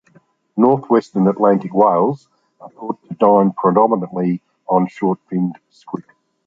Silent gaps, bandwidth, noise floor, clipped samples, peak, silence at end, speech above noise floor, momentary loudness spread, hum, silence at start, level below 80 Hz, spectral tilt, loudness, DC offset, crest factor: none; 7.2 kHz; -54 dBFS; under 0.1%; -2 dBFS; 0.45 s; 38 dB; 16 LU; none; 0.55 s; -62 dBFS; -10 dB/octave; -16 LUFS; under 0.1%; 16 dB